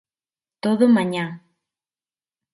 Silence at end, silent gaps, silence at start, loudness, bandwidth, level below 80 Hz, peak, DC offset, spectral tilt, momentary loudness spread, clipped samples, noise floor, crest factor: 1.15 s; none; 0.65 s; -20 LUFS; 11.5 kHz; -72 dBFS; -6 dBFS; under 0.1%; -7 dB/octave; 12 LU; under 0.1%; under -90 dBFS; 18 dB